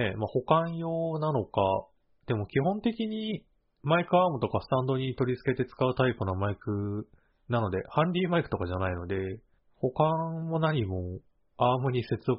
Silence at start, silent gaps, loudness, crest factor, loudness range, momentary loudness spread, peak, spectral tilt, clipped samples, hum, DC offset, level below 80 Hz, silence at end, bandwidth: 0 s; none; -29 LUFS; 20 dB; 2 LU; 8 LU; -8 dBFS; -6 dB/octave; under 0.1%; none; under 0.1%; -56 dBFS; 0 s; 5.4 kHz